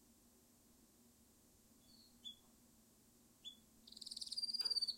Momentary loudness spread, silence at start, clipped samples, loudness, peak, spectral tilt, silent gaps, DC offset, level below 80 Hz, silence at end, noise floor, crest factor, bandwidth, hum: 30 LU; 0.1 s; under 0.1%; -45 LUFS; -30 dBFS; 0 dB/octave; none; under 0.1%; -82 dBFS; 0 s; -70 dBFS; 20 dB; 16.5 kHz; none